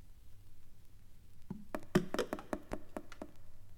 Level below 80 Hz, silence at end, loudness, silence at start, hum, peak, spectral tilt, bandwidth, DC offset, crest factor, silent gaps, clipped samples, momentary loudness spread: -54 dBFS; 0 s; -41 LUFS; 0 s; none; -16 dBFS; -6 dB/octave; 16.5 kHz; under 0.1%; 26 dB; none; under 0.1%; 27 LU